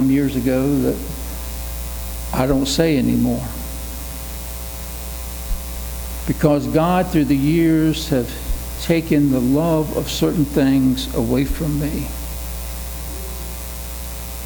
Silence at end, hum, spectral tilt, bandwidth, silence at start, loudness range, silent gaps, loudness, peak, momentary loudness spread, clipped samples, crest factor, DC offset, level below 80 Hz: 0 s; none; -6 dB/octave; over 20 kHz; 0 s; 6 LU; none; -20 LUFS; 0 dBFS; 12 LU; under 0.1%; 18 dB; under 0.1%; -30 dBFS